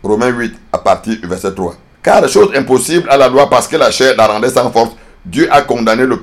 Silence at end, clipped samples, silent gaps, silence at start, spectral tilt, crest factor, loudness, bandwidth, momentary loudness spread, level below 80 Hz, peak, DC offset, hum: 0 s; 0.8%; none; 0.05 s; -4 dB/octave; 10 dB; -11 LUFS; 15.5 kHz; 11 LU; -40 dBFS; 0 dBFS; under 0.1%; none